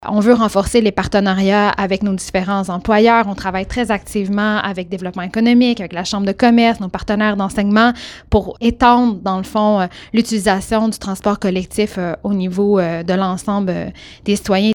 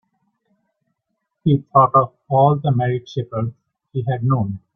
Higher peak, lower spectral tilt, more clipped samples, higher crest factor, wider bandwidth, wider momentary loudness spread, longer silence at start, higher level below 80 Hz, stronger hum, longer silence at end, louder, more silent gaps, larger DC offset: about the same, 0 dBFS vs -2 dBFS; second, -5.5 dB/octave vs -10 dB/octave; neither; about the same, 16 dB vs 18 dB; first, 17.5 kHz vs 6.2 kHz; second, 9 LU vs 12 LU; second, 0 s vs 1.45 s; first, -38 dBFS vs -56 dBFS; neither; second, 0 s vs 0.15 s; first, -16 LUFS vs -19 LUFS; neither; neither